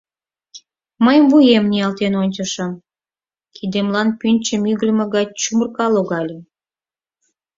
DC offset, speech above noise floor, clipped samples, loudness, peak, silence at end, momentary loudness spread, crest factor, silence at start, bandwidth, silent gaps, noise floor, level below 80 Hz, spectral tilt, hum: under 0.1%; over 74 dB; under 0.1%; -16 LUFS; -2 dBFS; 1.15 s; 14 LU; 16 dB; 0.55 s; 7.8 kHz; none; under -90 dBFS; -60 dBFS; -5 dB/octave; none